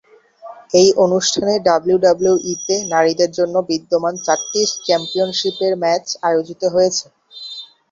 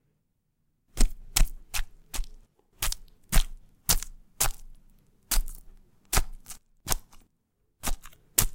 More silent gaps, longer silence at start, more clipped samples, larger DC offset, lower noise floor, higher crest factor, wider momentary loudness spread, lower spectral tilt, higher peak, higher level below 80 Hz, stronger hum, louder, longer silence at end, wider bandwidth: neither; second, 0.45 s vs 0.95 s; neither; neither; second, -39 dBFS vs -74 dBFS; second, 16 dB vs 28 dB; second, 6 LU vs 18 LU; first, -3.5 dB/octave vs -1.5 dB/octave; about the same, 0 dBFS vs -2 dBFS; second, -58 dBFS vs -32 dBFS; neither; first, -16 LUFS vs -31 LUFS; first, 0.25 s vs 0 s; second, 7.8 kHz vs 17 kHz